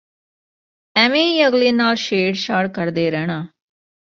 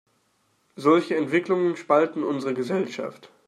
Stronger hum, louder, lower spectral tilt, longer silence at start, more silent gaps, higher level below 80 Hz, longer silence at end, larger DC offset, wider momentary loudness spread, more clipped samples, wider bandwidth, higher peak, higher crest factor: neither; first, -17 LUFS vs -24 LUFS; second, -5 dB/octave vs -6.5 dB/octave; first, 0.95 s vs 0.75 s; neither; first, -62 dBFS vs -76 dBFS; first, 0.65 s vs 0.2 s; neither; about the same, 9 LU vs 8 LU; neither; second, 7.6 kHz vs 11.5 kHz; first, -2 dBFS vs -6 dBFS; about the same, 18 dB vs 18 dB